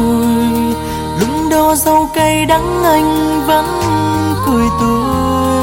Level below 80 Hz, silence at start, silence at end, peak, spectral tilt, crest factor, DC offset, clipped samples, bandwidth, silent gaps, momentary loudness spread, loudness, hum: -30 dBFS; 0 s; 0 s; 0 dBFS; -5 dB/octave; 12 dB; under 0.1%; under 0.1%; 17 kHz; none; 5 LU; -13 LUFS; none